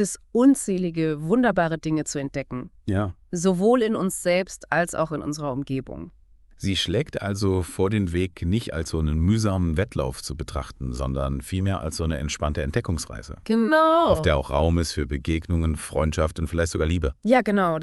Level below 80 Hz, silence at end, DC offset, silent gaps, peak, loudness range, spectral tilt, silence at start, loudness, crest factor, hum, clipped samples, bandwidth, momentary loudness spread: -36 dBFS; 0 s; under 0.1%; none; -6 dBFS; 5 LU; -5.5 dB/octave; 0 s; -24 LUFS; 18 dB; none; under 0.1%; 12 kHz; 11 LU